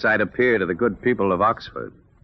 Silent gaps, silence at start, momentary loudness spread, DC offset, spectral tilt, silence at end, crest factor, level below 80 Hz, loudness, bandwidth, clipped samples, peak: none; 0 s; 15 LU; under 0.1%; -4.5 dB/octave; 0.35 s; 14 dB; -52 dBFS; -21 LUFS; 6 kHz; under 0.1%; -8 dBFS